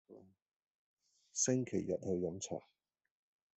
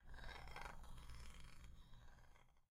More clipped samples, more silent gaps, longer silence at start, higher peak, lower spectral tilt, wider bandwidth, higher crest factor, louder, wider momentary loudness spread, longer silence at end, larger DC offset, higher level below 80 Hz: neither; first, 0.42-0.46 s, 0.56-0.97 s vs none; about the same, 0.1 s vs 0 s; first, -20 dBFS vs -38 dBFS; about the same, -4.5 dB/octave vs -4 dB/octave; second, 8.2 kHz vs 15.5 kHz; about the same, 22 dB vs 18 dB; first, -38 LUFS vs -60 LUFS; about the same, 11 LU vs 11 LU; first, 0.95 s vs 0.05 s; neither; second, -78 dBFS vs -58 dBFS